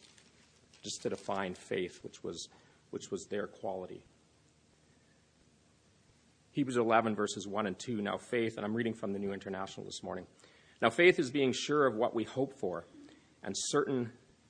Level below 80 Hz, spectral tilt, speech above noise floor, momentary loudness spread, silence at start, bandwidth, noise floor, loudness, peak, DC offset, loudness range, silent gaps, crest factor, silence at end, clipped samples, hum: -74 dBFS; -4.5 dB/octave; 33 dB; 15 LU; 0.85 s; 10 kHz; -67 dBFS; -34 LUFS; -10 dBFS; under 0.1%; 13 LU; none; 26 dB; 0.35 s; under 0.1%; none